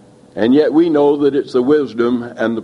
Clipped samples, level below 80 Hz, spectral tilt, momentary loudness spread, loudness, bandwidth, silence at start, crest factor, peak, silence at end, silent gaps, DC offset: under 0.1%; -58 dBFS; -7.5 dB/octave; 7 LU; -14 LUFS; 7.8 kHz; 0.35 s; 12 dB; -2 dBFS; 0 s; none; under 0.1%